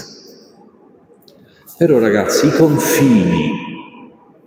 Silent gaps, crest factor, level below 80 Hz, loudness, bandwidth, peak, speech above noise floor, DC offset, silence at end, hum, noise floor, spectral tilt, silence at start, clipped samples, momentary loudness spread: none; 16 dB; -52 dBFS; -13 LUFS; 17 kHz; 0 dBFS; 35 dB; under 0.1%; 0.4 s; none; -47 dBFS; -5.5 dB/octave; 0 s; under 0.1%; 17 LU